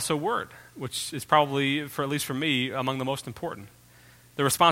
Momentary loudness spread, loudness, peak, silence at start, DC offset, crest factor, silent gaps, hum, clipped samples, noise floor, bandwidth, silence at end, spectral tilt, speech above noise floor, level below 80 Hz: 14 LU; -27 LUFS; -6 dBFS; 0 s; under 0.1%; 22 dB; none; none; under 0.1%; -54 dBFS; 16.5 kHz; 0 s; -4 dB/octave; 28 dB; -62 dBFS